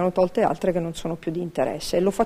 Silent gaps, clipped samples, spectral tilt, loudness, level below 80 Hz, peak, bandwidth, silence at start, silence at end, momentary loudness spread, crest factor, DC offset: none; under 0.1%; -6 dB/octave; -24 LUFS; -48 dBFS; -6 dBFS; 16 kHz; 0 s; 0 s; 7 LU; 16 dB; under 0.1%